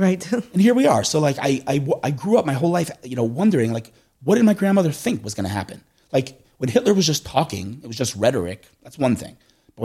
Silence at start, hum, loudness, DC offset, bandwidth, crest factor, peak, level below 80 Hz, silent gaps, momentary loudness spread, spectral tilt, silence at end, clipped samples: 0 s; none; -20 LUFS; under 0.1%; 15.5 kHz; 20 dB; 0 dBFS; -56 dBFS; none; 12 LU; -5.5 dB/octave; 0 s; under 0.1%